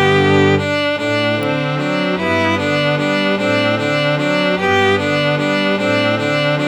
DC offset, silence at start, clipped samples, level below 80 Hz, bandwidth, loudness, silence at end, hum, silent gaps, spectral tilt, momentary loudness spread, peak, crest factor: 0.1%; 0 s; under 0.1%; -54 dBFS; 14 kHz; -15 LUFS; 0 s; none; none; -5.5 dB/octave; 4 LU; -2 dBFS; 14 dB